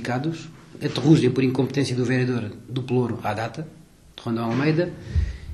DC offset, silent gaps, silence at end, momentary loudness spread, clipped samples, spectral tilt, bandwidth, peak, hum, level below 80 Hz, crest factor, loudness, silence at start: under 0.1%; none; 0 s; 14 LU; under 0.1%; -7 dB/octave; 12.5 kHz; -4 dBFS; none; -38 dBFS; 20 dB; -23 LUFS; 0 s